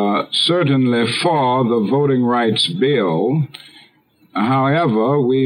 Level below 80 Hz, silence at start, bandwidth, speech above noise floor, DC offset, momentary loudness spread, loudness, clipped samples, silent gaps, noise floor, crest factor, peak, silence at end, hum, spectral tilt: -68 dBFS; 0 s; 11 kHz; 38 dB; under 0.1%; 3 LU; -16 LUFS; under 0.1%; none; -54 dBFS; 12 dB; -4 dBFS; 0 s; none; -6 dB/octave